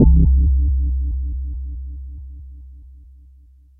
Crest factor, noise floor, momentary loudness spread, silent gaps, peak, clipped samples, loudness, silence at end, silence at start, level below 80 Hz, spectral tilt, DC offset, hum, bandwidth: 18 dB; -48 dBFS; 24 LU; none; 0 dBFS; under 0.1%; -19 LUFS; 1 s; 0 s; -20 dBFS; -16.5 dB/octave; under 0.1%; none; 0.9 kHz